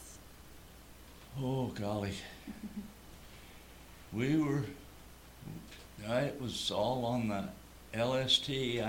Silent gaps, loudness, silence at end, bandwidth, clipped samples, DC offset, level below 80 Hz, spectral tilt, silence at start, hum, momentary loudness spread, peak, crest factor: none; -35 LUFS; 0 s; 18 kHz; under 0.1%; under 0.1%; -58 dBFS; -5 dB/octave; 0 s; none; 23 LU; -14 dBFS; 22 dB